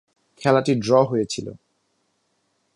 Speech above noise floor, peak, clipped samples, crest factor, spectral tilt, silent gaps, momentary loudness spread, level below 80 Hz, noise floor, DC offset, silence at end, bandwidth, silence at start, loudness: 50 dB; -2 dBFS; under 0.1%; 20 dB; -6 dB/octave; none; 12 LU; -60 dBFS; -70 dBFS; under 0.1%; 1.2 s; 11.5 kHz; 0.4 s; -21 LUFS